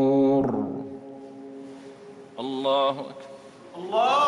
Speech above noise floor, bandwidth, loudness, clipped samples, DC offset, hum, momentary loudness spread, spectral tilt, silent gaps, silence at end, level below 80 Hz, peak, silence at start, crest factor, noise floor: 22 dB; 11 kHz; -25 LUFS; under 0.1%; under 0.1%; none; 22 LU; -6 dB/octave; none; 0 s; -68 dBFS; -12 dBFS; 0 s; 12 dB; -45 dBFS